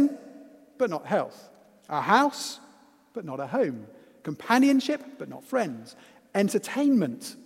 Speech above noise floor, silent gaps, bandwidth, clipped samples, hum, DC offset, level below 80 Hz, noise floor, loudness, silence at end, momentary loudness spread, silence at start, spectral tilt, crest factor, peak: 31 dB; none; 15.5 kHz; under 0.1%; none; under 0.1%; -78 dBFS; -57 dBFS; -26 LUFS; 0 s; 19 LU; 0 s; -5 dB/octave; 22 dB; -6 dBFS